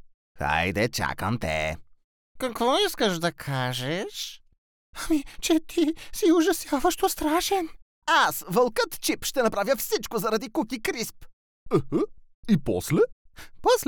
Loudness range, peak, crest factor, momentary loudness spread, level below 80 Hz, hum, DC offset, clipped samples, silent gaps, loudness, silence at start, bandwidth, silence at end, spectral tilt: 4 LU; -10 dBFS; 16 dB; 10 LU; -48 dBFS; none; under 0.1%; under 0.1%; 0.14-0.35 s, 2.04-2.35 s, 4.58-4.93 s, 7.82-8.02 s, 11.33-11.66 s, 12.34-12.43 s, 13.12-13.25 s; -26 LUFS; 0.05 s; over 20 kHz; 0 s; -4 dB/octave